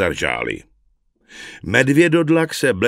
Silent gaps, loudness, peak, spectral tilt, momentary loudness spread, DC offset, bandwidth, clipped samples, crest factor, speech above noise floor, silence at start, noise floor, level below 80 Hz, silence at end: none; -17 LUFS; 0 dBFS; -5.5 dB/octave; 19 LU; under 0.1%; 16 kHz; under 0.1%; 18 dB; 44 dB; 0 s; -61 dBFS; -48 dBFS; 0 s